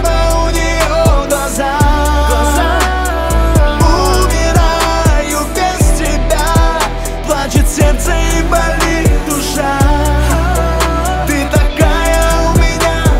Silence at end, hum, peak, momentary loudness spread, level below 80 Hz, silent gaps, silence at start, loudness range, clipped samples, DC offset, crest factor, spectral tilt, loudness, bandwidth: 0 s; none; 0 dBFS; 4 LU; -14 dBFS; none; 0 s; 1 LU; under 0.1%; under 0.1%; 10 dB; -4.5 dB/octave; -12 LUFS; 16.5 kHz